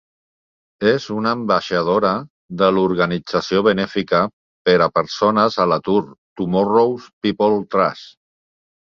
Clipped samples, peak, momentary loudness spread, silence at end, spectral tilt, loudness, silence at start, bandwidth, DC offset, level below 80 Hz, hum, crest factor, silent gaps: under 0.1%; -2 dBFS; 7 LU; 0.9 s; -6.5 dB/octave; -18 LUFS; 0.8 s; 7.2 kHz; under 0.1%; -54 dBFS; none; 16 dB; 2.30-2.49 s, 4.33-4.65 s, 6.18-6.36 s, 7.13-7.21 s